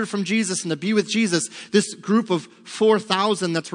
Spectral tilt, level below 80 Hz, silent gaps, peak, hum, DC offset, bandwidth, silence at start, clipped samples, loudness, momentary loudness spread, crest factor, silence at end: -4 dB/octave; -76 dBFS; none; -4 dBFS; none; under 0.1%; 10.5 kHz; 0 s; under 0.1%; -21 LUFS; 5 LU; 18 dB; 0 s